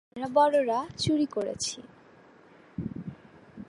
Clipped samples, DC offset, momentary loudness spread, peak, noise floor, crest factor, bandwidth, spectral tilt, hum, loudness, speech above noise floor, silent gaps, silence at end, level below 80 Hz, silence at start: under 0.1%; under 0.1%; 19 LU; -10 dBFS; -55 dBFS; 20 dB; 11.5 kHz; -4.5 dB/octave; none; -28 LUFS; 29 dB; none; 0.05 s; -60 dBFS; 0.15 s